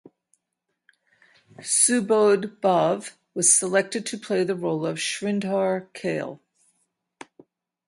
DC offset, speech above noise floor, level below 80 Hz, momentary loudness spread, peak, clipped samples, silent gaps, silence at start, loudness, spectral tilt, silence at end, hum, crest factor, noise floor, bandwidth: under 0.1%; 57 dB; -74 dBFS; 12 LU; -4 dBFS; under 0.1%; none; 1.6 s; -22 LUFS; -3 dB/octave; 1.5 s; none; 20 dB; -80 dBFS; 12 kHz